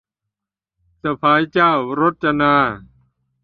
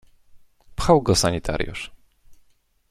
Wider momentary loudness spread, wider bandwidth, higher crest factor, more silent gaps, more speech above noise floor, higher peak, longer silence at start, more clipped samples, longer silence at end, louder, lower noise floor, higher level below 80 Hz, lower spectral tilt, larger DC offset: second, 10 LU vs 20 LU; second, 6.4 kHz vs 15 kHz; about the same, 18 dB vs 20 dB; neither; first, 69 dB vs 40 dB; about the same, -2 dBFS vs -4 dBFS; first, 1.05 s vs 0.35 s; neither; about the same, 0.65 s vs 0.55 s; first, -17 LUFS vs -21 LUFS; first, -86 dBFS vs -60 dBFS; second, -52 dBFS vs -38 dBFS; first, -8 dB/octave vs -4.5 dB/octave; neither